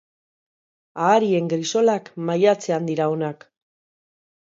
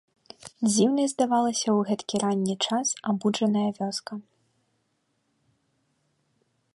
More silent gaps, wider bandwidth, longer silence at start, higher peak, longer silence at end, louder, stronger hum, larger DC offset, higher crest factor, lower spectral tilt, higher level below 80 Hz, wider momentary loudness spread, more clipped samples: neither; second, 7.8 kHz vs 11.5 kHz; first, 0.95 s vs 0.45 s; first, -4 dBFS vs -10 dBFS; second, 1.05 s vs 2.55 s; first, -21 LUFS vs -25 LUFS; neither; neither; about the same, 18 dB vs 18 dB; about the same, -5.5 dB/octave vs -4.5 dB/octave; about the same, -74 dBFS vs -72 dBFS; second, 8 LU vs 11 LU; neither